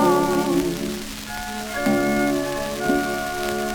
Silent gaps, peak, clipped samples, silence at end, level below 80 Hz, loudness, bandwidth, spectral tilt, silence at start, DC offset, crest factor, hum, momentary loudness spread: none; -6 dBFS; under 0.1%; 0 s; -42 dBFS; -23 LUFS; over 20 kHz; -4.5 dB/octave; 0 s; under 0.1%; 16 dB; none; 9 LU